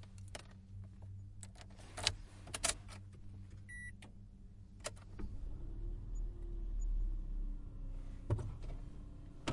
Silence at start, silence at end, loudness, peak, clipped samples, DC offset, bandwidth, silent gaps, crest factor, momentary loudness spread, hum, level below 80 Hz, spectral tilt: 0 s; 0 s; -46 LUFS; -8 dBFS; under 0.1%; under 0.1%; 11.5 kHz; none; 36 dB; 17 LU; none; -46 dBFS; -3 dB/octave